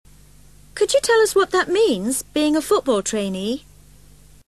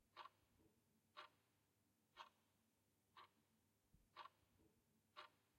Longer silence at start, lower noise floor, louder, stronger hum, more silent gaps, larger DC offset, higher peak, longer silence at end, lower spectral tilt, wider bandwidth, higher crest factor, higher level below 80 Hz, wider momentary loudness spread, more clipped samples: first, 0.75 s vs 0 s; second, -49 dBFS vs -85 dBFS; first, -19 LUFS vs -66 LUFS; first, 50 Hz at -45 dBFS vs none; neither; first, 0.2% vs under 0.1%; first, -6 dBFS vs -44 dBFS; first, 0.9 s vs 0 s; about the same, -3 dB/octave vs -2.5 dB/octave; second, 13 kHz vs 16 kHz; second, 16 dB vs 26 dB; first, -50 dBFS vs under -90 dBFS; first, 10 LU vs 5 LU; neither